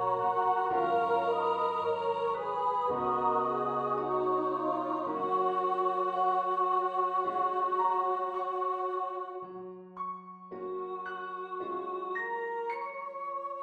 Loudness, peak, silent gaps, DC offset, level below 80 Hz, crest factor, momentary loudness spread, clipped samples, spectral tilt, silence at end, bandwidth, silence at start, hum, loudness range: -31 LUFS; -18 dBFS; none; under 0.1%; -72 dBFS; 14 dB; 10 LU; under 0.1%; -7 dB/octave; 0 s; 8.2 kHz; 0 s; none; 8 LU